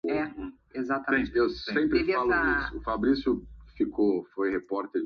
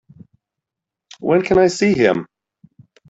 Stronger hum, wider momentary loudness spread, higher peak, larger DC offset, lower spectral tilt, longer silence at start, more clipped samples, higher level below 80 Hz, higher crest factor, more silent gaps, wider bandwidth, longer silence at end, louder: neither; about the same, 8 LU vs 9 LU; second, -12 dBFS vs -2 dBFS; neither; first, -7 dB/octave vs -5.5 dB/octave; second, 0.05 s vs 1.2 s; neither; about the same, -48 dBFS vs -50 dBFS; about the same, 16 dB vs 18 dB; neither; second, 6.4 kHz vs 8 kHz; second, 0 s vs 0.85 s; second, -28 LUFS vs -16 LUFS